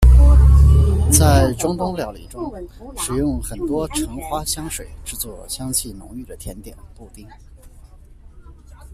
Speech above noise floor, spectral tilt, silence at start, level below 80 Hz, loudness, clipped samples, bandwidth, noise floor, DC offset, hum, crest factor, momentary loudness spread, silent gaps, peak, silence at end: 21 dB; -5.5 dB/octave; 0 s; -20 dBFS; -18 LUFS; under 0.1%; 14.5 kHz; -43 dBFS; under 0.1%; none; 18 dB; 22 LU; none; 0 dBFS; 0.55 s